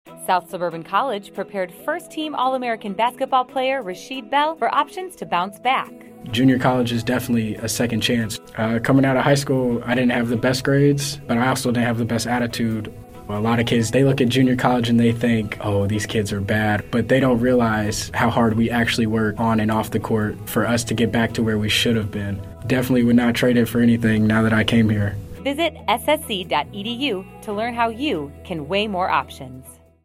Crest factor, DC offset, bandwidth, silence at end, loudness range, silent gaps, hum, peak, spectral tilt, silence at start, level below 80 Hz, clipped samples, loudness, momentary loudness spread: 18 dB; under 0.1%; 16 kHz; 0.3 s; 5 LU; none; none; -2 dBFS; -5.5 dB/octave; 0.05 s; -46 dBFS; under 0.1%; -20 LUFS; 10 LU